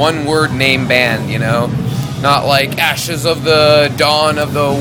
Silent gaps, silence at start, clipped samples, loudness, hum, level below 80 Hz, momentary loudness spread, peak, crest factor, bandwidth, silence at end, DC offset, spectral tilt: none; 0 s; 0.3%; -12 LUFS; none; -40 dBFS; 6 LU; 0 dBFS; 12 dB; 20 kHz; 0 s; under 0.1%; -4.5 dB/octave